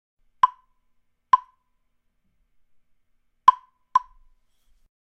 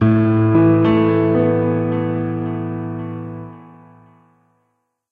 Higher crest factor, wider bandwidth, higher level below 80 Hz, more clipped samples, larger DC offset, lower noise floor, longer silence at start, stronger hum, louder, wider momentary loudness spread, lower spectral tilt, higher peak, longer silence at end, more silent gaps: first, 28 dB vs 14 dB; first, 8.6 kHz vs 4.4 kHz; second, -64 dBFS vs -48 dBFS; neither; neither; about the same, -70 dBFS vs -69 dBFS; first, 0.45 s vs 0 s; neither; second, -22 LUFS vs -17 LUFS; second, 6 LU vs 16 LU; second, -1 dB/octave vs -11.5 dB/octave; first, 0 dBFS vs -4 dBFS; second, 1.05 s vs 1.5 s; neither